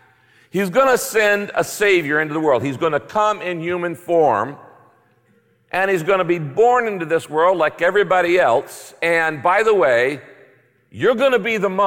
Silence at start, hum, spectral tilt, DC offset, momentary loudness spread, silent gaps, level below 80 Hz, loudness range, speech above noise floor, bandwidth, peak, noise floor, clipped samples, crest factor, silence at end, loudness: 0.55 s; none; -4.5 dB/octave; under 0.1%; 8 LU; none; -60 dBFS; 4 LU; 41 dB; 17 kHz; -6 dBFS; -58 dBFS; under 0.1%; 12 dB; 0 s; -17 LUFS